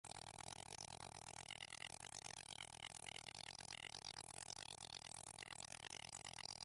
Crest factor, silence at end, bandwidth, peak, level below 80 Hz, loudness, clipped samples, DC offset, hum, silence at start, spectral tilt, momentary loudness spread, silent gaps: 20 dB; 0 s; 11.5 kHz; -34 dBFS; -76 dBFS; -53 LUFS; under 0.1%; under 0.1%; none; 0.05 s; -1 dB/octave; 2 LU; none